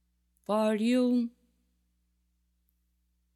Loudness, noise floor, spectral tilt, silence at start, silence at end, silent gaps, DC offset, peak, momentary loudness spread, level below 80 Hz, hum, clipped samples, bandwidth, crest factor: -28 LUFS; -75 dBFS; -6 dB/octave; 0.5 s; 2.05 s; none; under 0.1%; -16 dBFS; 11 LU; -74 dBFS; 60 Hz at -75 dBFS; under 0.1%; 13.5 kHz; 16 dB